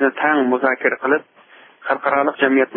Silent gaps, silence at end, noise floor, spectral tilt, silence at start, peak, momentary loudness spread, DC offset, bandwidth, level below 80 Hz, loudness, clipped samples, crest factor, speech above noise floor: none; 0 s; -37 dBFS; -9.5 dB/octave; 0 s; -2 dBFS; 5 LU; under 0.1%; 4.2 kHz; -68 dBFS; -18 LUFS; under 0.1%; 16 dB; 20 dB